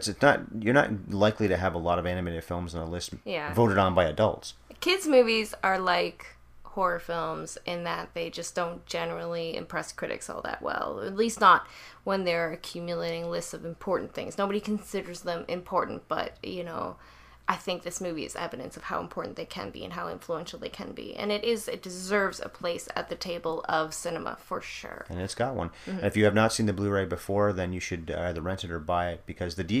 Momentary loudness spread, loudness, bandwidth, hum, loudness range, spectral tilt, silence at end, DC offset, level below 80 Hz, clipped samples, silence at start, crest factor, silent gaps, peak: 13 LU; -29 LUFS; 15.5 kHz; none; 8 LU; -5 dB/octave; 0 s; under 0.1%; -54 dBFS; under 0.1%; 0 s; 24 dB; none; -6 dBFS